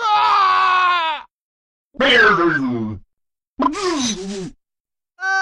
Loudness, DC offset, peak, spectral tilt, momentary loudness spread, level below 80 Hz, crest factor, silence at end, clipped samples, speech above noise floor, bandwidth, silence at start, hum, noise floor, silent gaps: -16 LUFS; under 0.1%; -4 dBFS; -3 dB/octave; 17 LU; -50 dBFS; 14 dB; 0 s; under 0.1%; 70 dB; 12 kHz; 0 s; none; -87 dBFS; 1.31-1.91 s, 3.47-3.57 s, 4.80-4.85 s